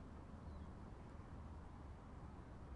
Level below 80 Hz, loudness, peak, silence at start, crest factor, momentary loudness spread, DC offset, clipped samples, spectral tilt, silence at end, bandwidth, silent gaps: -60 dBFS; -57 LUFS; -42 dBFS; 0 s; 12 dB; 2 LU; under 0.1%; under 0.1%; -8 dB/octave; 0 s; 10.5 kHz; none